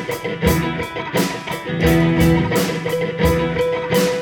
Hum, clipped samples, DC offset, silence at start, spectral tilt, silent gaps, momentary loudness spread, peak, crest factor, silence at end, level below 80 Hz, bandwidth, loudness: none; under 0.1%; under 0.1%; 0 s; -5.5 dB/octave; none; 8 LU; -2 dBFS; 16 dB; 0 s; -32 dBFS; 17.5 kHz; -18 LUFS